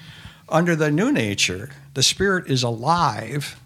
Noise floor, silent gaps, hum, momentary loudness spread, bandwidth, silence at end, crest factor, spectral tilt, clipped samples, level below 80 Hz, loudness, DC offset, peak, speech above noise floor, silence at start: -42 dBFS; none; none; 9 LU; 15.5 kHz; 0.1 s; 20 dB; -4 dB/octave; under 0.1%; -50 dBFS; -20 LUFS; under 0.1%; -2 dBFS; 21 dB; 0 s